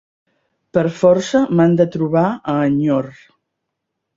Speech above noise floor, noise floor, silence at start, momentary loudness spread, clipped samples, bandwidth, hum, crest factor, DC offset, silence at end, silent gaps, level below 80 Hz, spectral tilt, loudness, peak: 62 dB; -77 dBFS; 0.75 s; 7 LU; under 0.1%; 7.8 kHz; none; 16 dB; under 0.1%; 1.05 s; none; -56 dBFS; -7.5 dB/octave; -16 LUFS; -2 dBFS